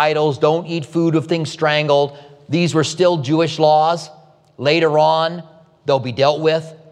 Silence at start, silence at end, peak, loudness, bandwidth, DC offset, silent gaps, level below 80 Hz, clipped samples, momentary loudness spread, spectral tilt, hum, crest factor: 0 s; 0.15 s; -2 dBFS; -17 LUFS; 11 kHz; under 0.1%; none; -68 dBFS; under 0.1%; 9 LU; -5.5 dB/octave; none; 16 dB